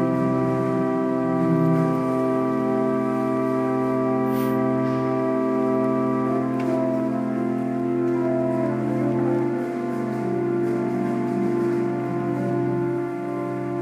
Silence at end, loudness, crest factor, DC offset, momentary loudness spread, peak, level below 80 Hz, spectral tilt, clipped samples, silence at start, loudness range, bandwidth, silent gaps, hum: 0 s; -23 LUFS; 14 dB; under 0.1%; 4 LU; -8 dBFS; -62 dBFS; -9 dB/octave; under 0.1%; 0 s; 2 LU; 15.5 kHz; none; none